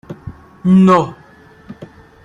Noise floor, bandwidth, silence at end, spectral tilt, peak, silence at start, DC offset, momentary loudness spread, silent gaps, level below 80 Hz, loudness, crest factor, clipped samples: -43 dBFS; 7.4 kHz; 0.4 s; -8.5 dB/octave; -2 dBFS; 0.1 s; under 0.1%; 26 LU; none; -48 dBFS; -12 LUFS; 14 dB; under 0.1%